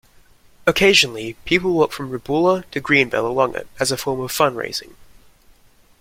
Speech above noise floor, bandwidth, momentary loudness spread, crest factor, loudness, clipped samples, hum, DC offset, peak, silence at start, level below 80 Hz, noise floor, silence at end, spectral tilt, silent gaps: 33 dB; 16.5 kHz; 12 LU; 20 dB; -18 LUFS; under 0.1%; none; under 0.1%; -2 dBFS; 0.65 s; -50 dBFS; -52 dBFS; 1.15 s; -3.5 dB/octave; none